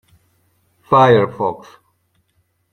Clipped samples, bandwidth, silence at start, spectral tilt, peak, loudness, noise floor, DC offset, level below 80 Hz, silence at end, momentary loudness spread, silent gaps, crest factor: under 0.1%; 9.4 kHz; 0.9 s; -7.5 dB/octave; -2 dBFS; -14 LUFS; -65 dBFS; under 0.1%; -56 dBFS; 1.15 s; 13 LU; none; 18 dB